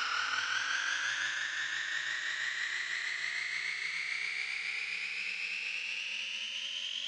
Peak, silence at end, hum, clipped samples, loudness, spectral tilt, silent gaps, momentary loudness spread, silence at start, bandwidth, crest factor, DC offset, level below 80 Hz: -22 dBFS; 0 s; none; under 0.1%; -34 LUFS; 2.5 dB/octave; none; 3 LU; 0 s; 11.5 kHz; 14 dB; under 0.1%; -82 dBFS